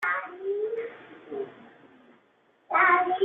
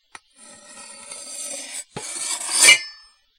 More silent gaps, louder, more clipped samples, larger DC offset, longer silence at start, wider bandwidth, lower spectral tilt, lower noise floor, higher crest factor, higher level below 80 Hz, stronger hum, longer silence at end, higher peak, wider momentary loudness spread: neither; second, -26 LUFS vs -16 LUFS; neither; neither; second, 0 s vs 0.45 s; second, 5.6 kHz vs 16 kHz; first, -5.5 dB/octave vs 2 dB/octave; first, -65 dBFS vs -48 dBFS; about the same, 20 dB vs 24 dB; second, -78 dBFS vs -68 dBFS; neither; second, 0 s vs 0.45 s; second, -8 dBFS vs 0 dBFS; second, 20 LU vs 26 LU